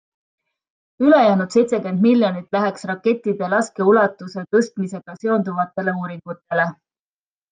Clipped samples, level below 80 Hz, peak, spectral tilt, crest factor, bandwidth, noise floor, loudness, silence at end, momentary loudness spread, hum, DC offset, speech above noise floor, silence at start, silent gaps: under 0.1%; -70 dBFS; -2 dBFS; -6.5 dB/octave; 16 dB; 9.4 kHz; under -90 dBFS; -19 LUFS; 0.8 s; 12 LU; none; under 0.1%; over 72 dB; 1 s; none